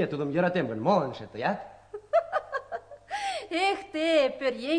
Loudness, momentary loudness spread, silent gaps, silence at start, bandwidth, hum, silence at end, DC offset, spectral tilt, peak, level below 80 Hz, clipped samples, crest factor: -28 LUFS; 13 LU; none; 0 s; 10.5 kHz; none; 0 s; under 0.1%; -5.5 dB/octave; -10 dBFS; -66 dBFS; under 0.1%; 18 dB